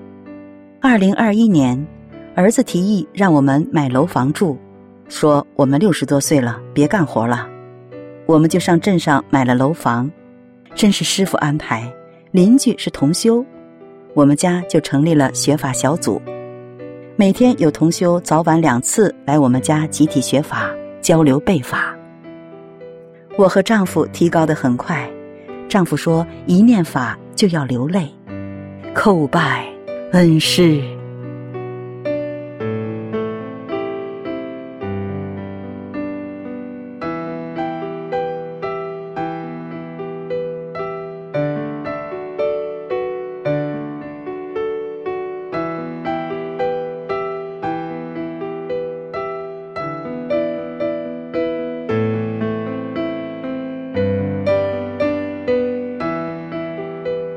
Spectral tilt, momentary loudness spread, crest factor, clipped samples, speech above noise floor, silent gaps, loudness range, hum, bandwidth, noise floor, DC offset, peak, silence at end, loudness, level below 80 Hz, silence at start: -5.5 dB/octave; 16 LU; 16 dB; under 0.1%; 29 dB; none; 10 LU; none; 16 kHz; -43 dBFS; under 0.1%; -2 dBFS; 0 s; -18 LUFS; -52 dBFS; 0 s